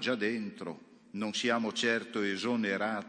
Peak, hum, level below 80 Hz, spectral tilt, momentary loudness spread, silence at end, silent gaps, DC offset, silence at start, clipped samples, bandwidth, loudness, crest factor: -14 dBFS; none; -82 dBFS; -4 dB/octave; 14 LU; 0 s; none; under 0.1%; 0 s; under 0.1%; 10 kHz; -32 LUFS; 18 dB